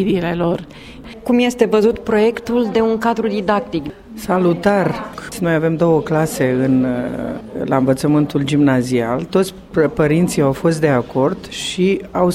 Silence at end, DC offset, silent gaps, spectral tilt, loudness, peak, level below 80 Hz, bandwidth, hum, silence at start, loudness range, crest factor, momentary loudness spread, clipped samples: 0 s; under 0.1%; none; -6.5 dB/octave; -17 LUFS; 0 dBFS; -44 dBFS; 16 kHz; none; 0 s; 2 LU; 16 dB; 10 LU; under 0.1%